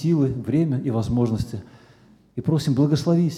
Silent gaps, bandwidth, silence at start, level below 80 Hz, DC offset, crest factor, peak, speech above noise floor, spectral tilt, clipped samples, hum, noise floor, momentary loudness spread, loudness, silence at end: none; 13.5 kHz; 0 s; -48 dBFS; under 0.1%; 14 dB; -8 dBFS; 32 dB; -8 dB/octave; under 0.1%; none; -53 dBFS; 10 LU; -22 LUFS; 0 s